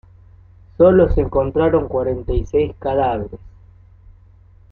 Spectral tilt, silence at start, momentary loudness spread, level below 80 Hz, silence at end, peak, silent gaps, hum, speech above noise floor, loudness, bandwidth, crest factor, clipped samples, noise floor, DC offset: -9.5 dB/octave; 0.8 s; 9 LU; -30 dBFS; 1.25 s; -2 dBFS; none; none; 31 dB; -17 LUFS; 6.6 kHz; 16 dB; under 0.1%; -47 dBFS; under 0.1%